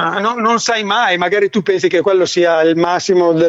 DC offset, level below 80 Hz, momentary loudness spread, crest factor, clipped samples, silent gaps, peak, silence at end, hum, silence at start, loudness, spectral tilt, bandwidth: under 0.1%; -60 dBFS; 3 LU; 10 dB; under 0.1%; none; -2 dBFS; 0 s; none; 0 s; -13 LUFS; -4 dB/octave; 8 kHz